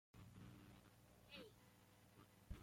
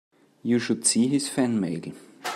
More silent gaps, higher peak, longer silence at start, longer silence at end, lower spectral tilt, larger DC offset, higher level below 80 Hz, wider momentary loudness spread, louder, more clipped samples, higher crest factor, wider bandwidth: neither; second, -40 dBFS vs -8 dBFS; second, 0.15 s vs 0.45 s; about the same, 0 s vs 0 s; about the same, -5 dB/octave vs -4 dB/octave; neither; about the same, -68 dBFS vs -72 dBFS; second, 9 LU vs 14 LU; second, -64 LUFS vs -24 LUFS; neither; about the same, 22 dB vs 18 dB; first, 16.5 kHz vs 14 kHz